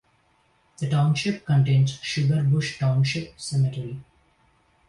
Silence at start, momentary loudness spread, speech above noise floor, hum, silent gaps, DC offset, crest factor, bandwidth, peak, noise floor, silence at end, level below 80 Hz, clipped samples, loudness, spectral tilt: 0.8 s; 11 LU; 42 dB; none; none; under 0.1%; 14 dB; 11 kHz; -10 dBFS; -64 dBFS; 0.85 s; -56 dBFS; under 0.1%; -23 LUFS; -6 dB/octave